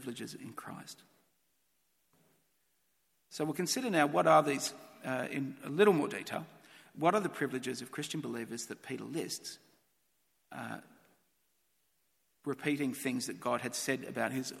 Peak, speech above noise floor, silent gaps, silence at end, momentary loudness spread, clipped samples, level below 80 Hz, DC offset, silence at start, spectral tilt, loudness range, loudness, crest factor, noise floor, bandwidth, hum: -12 dBFS; 44 dB; none; 0 s; 19 LU; under 0.1%; -82 dBFS; under 0.1%; 0 s; -4 dB/octave; 15 LU; -34 LUFS; 24 dB; -78 dBFS; 16.5 kHz; none